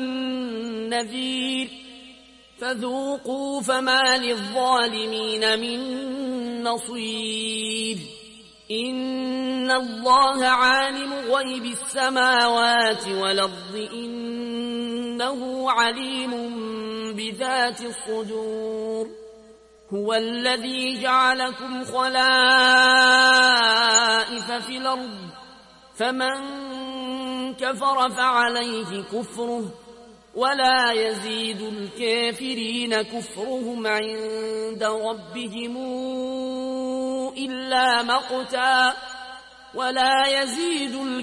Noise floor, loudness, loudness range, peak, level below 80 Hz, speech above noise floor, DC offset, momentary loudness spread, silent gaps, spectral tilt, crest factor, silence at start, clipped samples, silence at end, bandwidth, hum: -50 dBFS; -22 LUFS; 11 LU; -6 dBFS; -64 dBFS; 27 dB; under 0.1%; 14 LU; none; -1.5 dB/octave; 18 dB; 0 s; under 0.1%; 0 s; 11.5 kHz; none